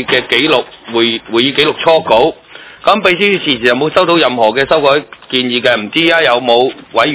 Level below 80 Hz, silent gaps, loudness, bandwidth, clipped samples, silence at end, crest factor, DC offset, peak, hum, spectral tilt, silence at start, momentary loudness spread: -48 dBFS; none; -11 LUFS; 4 kHz; 0.9%; 0 s; 12 dB; under 0.1%; 0 dBFS; none; -8 dB/octave; 0 s; 5 LU